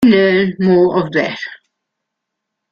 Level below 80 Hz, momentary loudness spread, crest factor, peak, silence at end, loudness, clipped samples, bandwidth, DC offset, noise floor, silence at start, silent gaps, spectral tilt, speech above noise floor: -54 dBFS; 13 LU; 14 dB; -2 dBFS; 1.15 s; -13 LUFS; under 0.1%; 7 kHz; under 0.1%; -77 dBFS; 0 s; none; -7.5 dB/octave; 64 dB